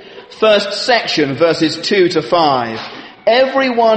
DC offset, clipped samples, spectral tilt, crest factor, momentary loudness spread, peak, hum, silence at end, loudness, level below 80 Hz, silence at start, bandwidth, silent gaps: under 0.1%; under 0.1%; -4.5 dB/octave; 14 dB; 7 LU; 0 dBFS; none; 0 s; -13 LUFS; -56 dBFS; 0 s; 8.8 kHz; none